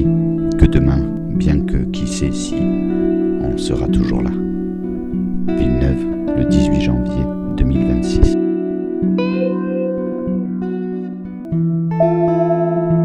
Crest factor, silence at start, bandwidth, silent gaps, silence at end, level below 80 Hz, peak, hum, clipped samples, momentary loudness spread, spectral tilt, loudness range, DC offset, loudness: 16 dB; 0 s; 10.5 kHz; none; 0 s; -24 dBFS; 0 dBFS; none; under 0.1%; 7 LU; -8 dB/octave; 2 LU; under 0.1%; -17 LUFS